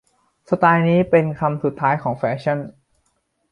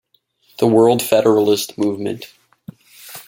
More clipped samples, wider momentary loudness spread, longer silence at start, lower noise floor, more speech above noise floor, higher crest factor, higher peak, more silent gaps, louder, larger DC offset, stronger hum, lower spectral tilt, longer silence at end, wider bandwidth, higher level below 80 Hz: neither; second, 9 LU vs 14 LU; about the same, 0.5 s vs 0.6 s; first, -68 dBFS vs -59 dBFS; first, 50 dB vs 44 dB; about the same, 18 dB vs 18 dB; about the same, -2 dBFS vs 0 dBFS; neither; second, -19 LUFS vs -16 LUFS; neither; neither; first, -9 dB/octave vs -5 dB/octave; first, 0.8 s vs 0.05 s; second, 5.6 kHz vs 17 kHz; first, -56 dBFS vs -62 dBFS